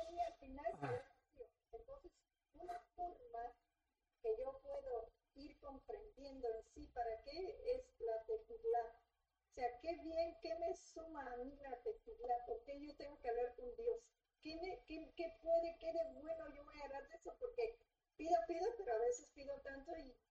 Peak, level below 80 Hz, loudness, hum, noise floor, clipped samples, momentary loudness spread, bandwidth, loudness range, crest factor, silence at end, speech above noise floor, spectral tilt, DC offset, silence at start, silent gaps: -26 dBFS; -68 dBFS; -47 LUFS; none; under -90 dBFS; under 0.1%; 16 LU; 8.4 kHz; 6 LU; 22 dB; 0.2 s; over 44 dB; -5 dB/octave; under 0.1%; 0 s; none